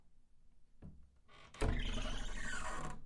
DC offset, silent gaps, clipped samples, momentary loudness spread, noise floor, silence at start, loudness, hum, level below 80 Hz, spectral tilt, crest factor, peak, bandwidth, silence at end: under 0.1%; none; under 0.1%; 20 LU; -61 dBFS; 0.05 s; -43 LUFS; none; -44 dBFS; -4 dB/octave; 20 dB; -22 dBFS; 11.5 kHz; 0 s